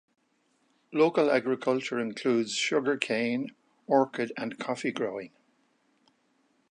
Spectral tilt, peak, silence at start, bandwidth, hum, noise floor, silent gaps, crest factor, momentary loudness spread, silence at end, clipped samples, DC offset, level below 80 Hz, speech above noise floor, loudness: -4.5 dB/octave; -8 dBFS; 0.9 s; 10.5 kHz; none; -71 dBFS; none; 22 dB; 9 LU; 1.45 s; under 0.1%; under 0.1%; -82 dBFS; 43 dB; -28 LUFS